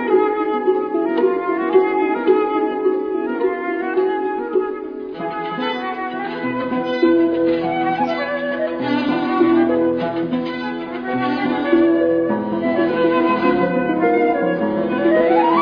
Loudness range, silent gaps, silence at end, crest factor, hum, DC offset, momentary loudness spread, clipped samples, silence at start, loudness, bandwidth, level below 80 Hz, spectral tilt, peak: 4 LU; none; 0 s; 16 dB; none; under 0.1%; 8 LU; under 0.1%; 0 s; -18 LUFS; 5.4 kHz; -56 dBFS; -8.5 dB/octave; -2 dBFS